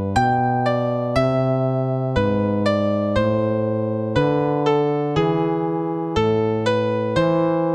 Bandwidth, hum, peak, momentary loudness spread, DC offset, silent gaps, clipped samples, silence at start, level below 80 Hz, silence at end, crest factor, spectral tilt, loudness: 10 kHz; none; -6 dBFS; 3 LU; under 0.1%; none; under 0.1%; 0 s; -42 dBFS; 0 s; 14 dB; -7.5 dB/octave; -20 LUFS